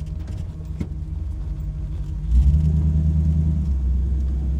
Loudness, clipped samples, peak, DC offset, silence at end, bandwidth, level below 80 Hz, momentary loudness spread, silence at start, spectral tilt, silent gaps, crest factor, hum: -23 LUFS; under 0.1%; -6 dBFS; under 0.1%; 0 s; 3.6 kHz; -24 dBFS; 12 LU; 0 s; -10 dB/octave; none; 14 dB; none